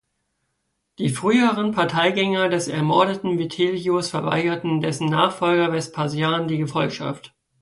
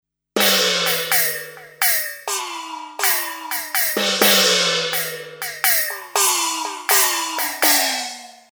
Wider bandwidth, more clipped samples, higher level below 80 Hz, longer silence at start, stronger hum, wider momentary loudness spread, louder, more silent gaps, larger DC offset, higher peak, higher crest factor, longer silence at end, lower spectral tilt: second, 11.5 kHz vs over 20 kHz; neither; about the same, -62 dBFS vs -64 dBFS; first, 1 s vs 0.35 s; neither; second, 7 LU vs 14 LU; second, -21 LUFS vs -17 LUFS; neither; neither; second, -4 dBFS vs 0 dBFS; about the same, 18 dB vs 20 dB; first, 0.35 s vs 0.2 s; first, -5.5 dB/octave vs 0 dB/octave